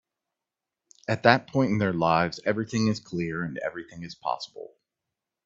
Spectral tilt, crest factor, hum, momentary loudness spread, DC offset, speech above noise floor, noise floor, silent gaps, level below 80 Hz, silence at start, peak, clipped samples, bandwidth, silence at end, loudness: -6 dB/octave; 28 dB; none; 18 LU; under 0.1%; 62 dB; -88 dBFS; none; -62 dBFS; 1.1 s; 0 dBFS; under 0.1%; 7.8 kHz; 0.8 s; -26 LUFS